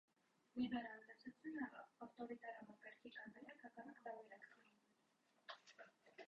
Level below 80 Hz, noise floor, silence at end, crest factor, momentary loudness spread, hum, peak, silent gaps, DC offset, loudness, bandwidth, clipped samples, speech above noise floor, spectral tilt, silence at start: -88 dBFS; -82 dBFS; 0.05 s; 22 dB; 16 LU; none; -34 dBFS; none; under 0.1%; -54 LUFS; 7.6 kHz; under 0.1%; 29 dB; -3 dB/octave; 0.55 s